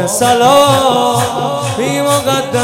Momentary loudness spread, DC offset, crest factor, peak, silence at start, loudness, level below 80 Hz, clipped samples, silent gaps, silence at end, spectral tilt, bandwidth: 8 LU; under 0.1%; 12 dB; 0 dBFS; 0 s; -11 LUFS; -48 dBFS; 0.4%; none; 0 s; -4 dB/octave; 17.5 kHz